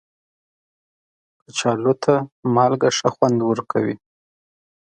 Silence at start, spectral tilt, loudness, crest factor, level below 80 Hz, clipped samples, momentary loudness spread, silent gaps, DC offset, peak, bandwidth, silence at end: 1.55 s; -5 dB/octave; -20 LUFS; 22 dB; -64 dBFS; under 0.1%; 7 LU; 2.32-2.43 s; under 0.1%; 0 dBFS; 9.6 kHz; 0.9 s